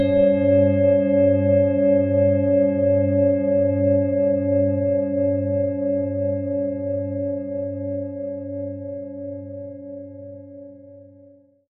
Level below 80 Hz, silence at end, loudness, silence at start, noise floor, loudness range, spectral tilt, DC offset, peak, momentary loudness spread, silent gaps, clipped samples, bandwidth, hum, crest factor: -60 dBFS; 0.7 s; -20 LUFS; 0 s; -51 dBFS; 14 LU; -10 dB/octave; under 0.1%; -6 dBFS; 18 LU; none; under 0.1%; 4 kHz; none; 14 dB